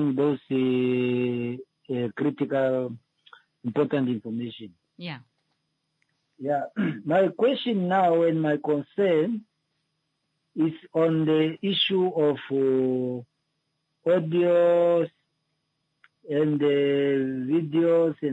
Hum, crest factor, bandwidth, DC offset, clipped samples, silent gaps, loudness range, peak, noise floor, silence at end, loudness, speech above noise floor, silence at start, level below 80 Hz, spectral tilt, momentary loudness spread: none; 14 dB; 8 kHz; under 0.1%; under 0.1%; none; 7 LU; -10 dBFS; -77 dBFS; 0 s; -25 LUFS; 53 dB; 0 s; -76 dBFS; -8.5 dB/octave; 13 LU